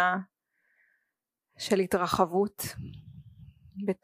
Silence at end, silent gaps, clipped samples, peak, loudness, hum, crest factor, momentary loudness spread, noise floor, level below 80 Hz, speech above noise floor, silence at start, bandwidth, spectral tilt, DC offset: 0.1 s; none; under 0.1%; -8 dBFS; -29 LUFS; none; 22 dB; 23 LU; -84 dBFS; -60 dBFS; 56 dB; 0 s; 15.5 kHz; -5 dB/octave; under 0.1%